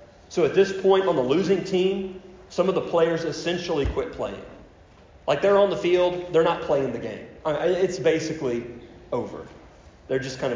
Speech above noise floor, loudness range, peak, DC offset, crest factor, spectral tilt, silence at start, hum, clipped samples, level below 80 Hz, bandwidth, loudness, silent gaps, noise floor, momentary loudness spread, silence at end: 28 dB; 4 LU; -8 dBFS; under 0.1%; 16 dB; -5.5 dB/octave; 0 s; none; under 0.1%; -46 dBFS; 7.6 kHz; -24 LUFS; none; -51 dBFS; 13 LU; 0 s